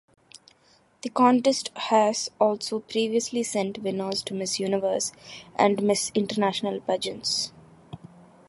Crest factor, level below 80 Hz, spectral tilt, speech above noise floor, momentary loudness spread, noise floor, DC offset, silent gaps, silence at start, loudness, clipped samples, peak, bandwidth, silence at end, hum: 20 dB; -68 dBFS; -3.5 dB/octave; 36 dB; 12 LU; -61 dBFS; under 0.1%; none; 1.05 s; -25 LUFS; under 0.1%; -8 dBFS; 11.5 kHz; 0.5 s; none